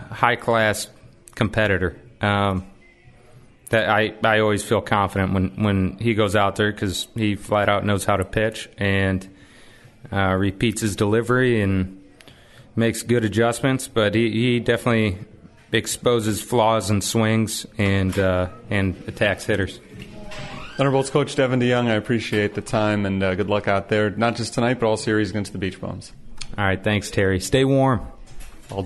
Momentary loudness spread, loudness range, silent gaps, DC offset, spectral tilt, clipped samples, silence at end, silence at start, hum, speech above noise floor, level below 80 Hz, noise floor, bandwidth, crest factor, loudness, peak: 9 LU; 2 LU; none; under 0.1%; -5.5 dB/octave; under 0.1%; 0 s; 0 s; none; 29 dB; -46 dBFS; -49 dBFS; 12 kHz; 22 dB; -21 LUFS; 0 dBFS